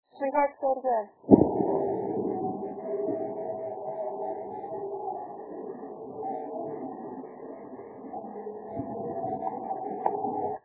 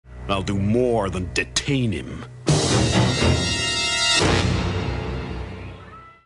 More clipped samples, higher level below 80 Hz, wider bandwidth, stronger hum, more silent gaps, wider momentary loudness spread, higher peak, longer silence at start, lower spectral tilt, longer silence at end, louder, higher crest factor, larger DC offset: neither; second, -58 dBFS vs -34 dBFS; second, 4 kHz vs 11.5 kHz; neither; neither; about the same, 14 LU vs 15 LU; first, 0 dBFS vs -6 dBFS; about the same, 0.15 s vs 0.05 s; first, -10 dB/octave vs -4 dB/octave; about the same, 0.05 s vs 0.15 s; second, -31 LUFS vs -21 LUFS; first, 30 dB vs 16 dB; neither